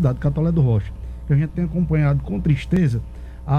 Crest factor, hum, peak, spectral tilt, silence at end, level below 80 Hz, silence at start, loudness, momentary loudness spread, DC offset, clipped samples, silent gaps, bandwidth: 14 dB; none; -6 dBFS; -9.5 dB/octave; 0 s; -32 dBFS; 0 s; -20 LUFS; 14 LU; under 0.1%; under 0.1%; none; 6.6 kHz